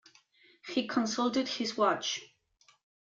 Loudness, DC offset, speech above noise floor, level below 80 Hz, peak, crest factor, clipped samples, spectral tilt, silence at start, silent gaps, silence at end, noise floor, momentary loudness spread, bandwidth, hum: -31 LUFS; under 0.1%; 37 dB; -78 dBFS; -14 dBFS; 20 dB; under 0.1%; -3 dB/octave; 0.65 s; none; 0.75 s; -68 dBFS; 7 LU; 7.6 kHz; none